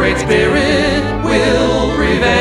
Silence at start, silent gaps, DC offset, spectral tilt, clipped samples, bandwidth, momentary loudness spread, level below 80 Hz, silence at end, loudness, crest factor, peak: 0 s; none; under 0.1%; -5 dB/octave; under 0.1%; 12.5 kHz; 3 LU; -26 dBFS; 0 s; -13 LUFS; 12 dB; 0 dBFS